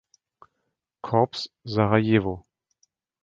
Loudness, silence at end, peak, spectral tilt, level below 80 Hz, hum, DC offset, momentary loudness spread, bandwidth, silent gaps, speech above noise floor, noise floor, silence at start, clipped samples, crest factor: -24 LUFS; 0.85 s; -4 dBFS; -7.5 dB/octave; -54 dBFS; none; under 0.1%; 15 LU; 7.6 kHz; none; 56 dB; -79 dBFS; 1.05 s; under 0.1%; 22 dB